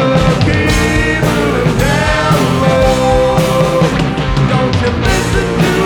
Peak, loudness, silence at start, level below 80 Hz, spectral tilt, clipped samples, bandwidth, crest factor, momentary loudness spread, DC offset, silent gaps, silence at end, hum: 0 dBFS; -12 LUFS; 0 s; -22 dBFS; -5.5 dB/octave; under 0.1%; 19 kHz; 10 dB; 3 LU; under 0.1%; none; 0 s; none